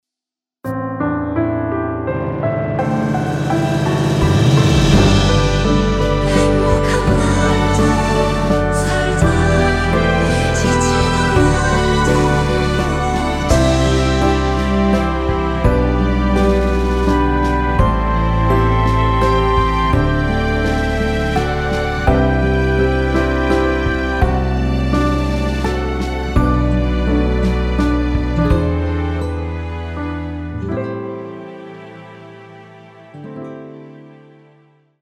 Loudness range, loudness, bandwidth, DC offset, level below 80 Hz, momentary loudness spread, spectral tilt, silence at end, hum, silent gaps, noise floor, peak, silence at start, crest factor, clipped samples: 9 LU; -16 LUFS; 13.5 kHz; under 0.1%; -22 dBFS; 10 LU; -6 dB/octave; 0.9 s; none; none; -87 dBFS; 0 dBFS; 0.65 s; 16 dB; under 0.1%